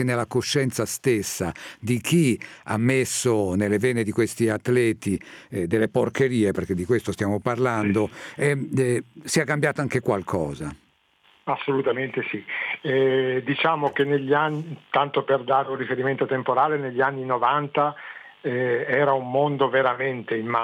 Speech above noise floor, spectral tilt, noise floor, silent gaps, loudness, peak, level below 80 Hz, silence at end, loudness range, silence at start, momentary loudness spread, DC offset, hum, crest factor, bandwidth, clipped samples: 38 dB; -5.5 dB/octave; -61 dBFS; none; -23 LUFS; -8 dBFS; -58 dBFS; 0 s; 3 LU; 0 s; 8 LU; under 0.1%; none; 16 dB; 17 kHz; under 0.1%